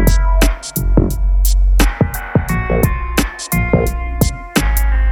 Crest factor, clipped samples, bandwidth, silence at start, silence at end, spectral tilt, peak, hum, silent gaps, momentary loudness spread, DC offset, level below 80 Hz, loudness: 14 dB; under 0.1%; 18 kHz; 0 s; 0 s; -5.5 dB/octave; 0 dBFS; none; none; 4 LU; under 0.1%; -16 dBFS; -16 LUFS